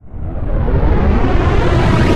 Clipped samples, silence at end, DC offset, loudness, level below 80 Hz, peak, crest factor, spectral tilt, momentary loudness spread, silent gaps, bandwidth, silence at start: under 0.1%; 0 s; under 0.1%; -15 LUFS; -16 dBFS; -2 dBFS; 10 dB; -7.5 dB/octave; 10 LU; none; 9.6 kHz; 0.05 s